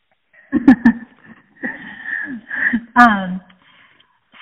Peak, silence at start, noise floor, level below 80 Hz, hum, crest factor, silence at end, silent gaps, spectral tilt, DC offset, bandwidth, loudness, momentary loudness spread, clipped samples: 0 dBFS; 0.5 s; -55 dBFS; -50 dBFS; none; 18 dB; 1 s; none; -4 dB/octave; under 0.1%; 5.8 kHz; -16 LUFS; 17 LU; 0.2%